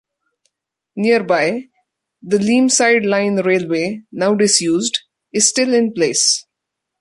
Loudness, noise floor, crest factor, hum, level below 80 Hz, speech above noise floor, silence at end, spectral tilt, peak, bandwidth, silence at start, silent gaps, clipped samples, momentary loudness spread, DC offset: -15 LUFS; -80 dBFS; 18 dB; none; -62 dBFS; 64 dB; 0.6 s; -3 dB/octave; 0 dBFS; 11.5 kHz; 0.95 s; none; under 0.1%; 8 LU; under 0.1%